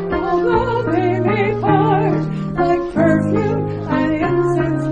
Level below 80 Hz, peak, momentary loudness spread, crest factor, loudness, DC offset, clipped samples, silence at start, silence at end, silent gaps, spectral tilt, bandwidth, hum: -38 dBFS; -2 dBFS; 5 LU; 14 dB; -17 LUFS; under 0.1%; under 0.1%; 0 s; 0 s; none; -8.5 dB/octave; 8.8 kHz; none